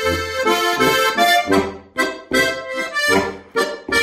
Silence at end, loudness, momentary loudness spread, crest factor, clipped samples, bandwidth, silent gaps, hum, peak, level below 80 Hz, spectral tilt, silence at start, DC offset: 0 s; -17 LUFS; 8 LU; 16 dB; under 0.1%; 16 kHz; none; none; -2 dBFS; -46 dBFS; -3 dB/octave; 0 s; under 0.1%